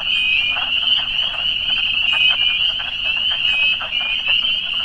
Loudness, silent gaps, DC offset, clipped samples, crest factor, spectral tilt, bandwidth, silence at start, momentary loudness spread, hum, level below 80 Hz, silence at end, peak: -15 LUFS; none; under 0.1%; under 0.1%; 14 dB; -1 dB/octave; 9.4 kHz; 0 s; 5 LU; none; -44 dBFS; 0 s; -4 dBFS